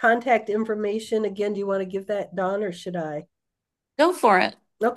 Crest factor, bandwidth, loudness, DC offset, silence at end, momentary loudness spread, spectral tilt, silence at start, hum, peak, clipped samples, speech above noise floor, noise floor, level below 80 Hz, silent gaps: 18 dB; 12.5 kHz; -24 LUFS; under 0.1%; 0 s; 12 LU; -5 dB/octave; 0 s; none; -6 dBFS; under 0.1%; 61 dB; -84 dBFS; -76 dBFS; none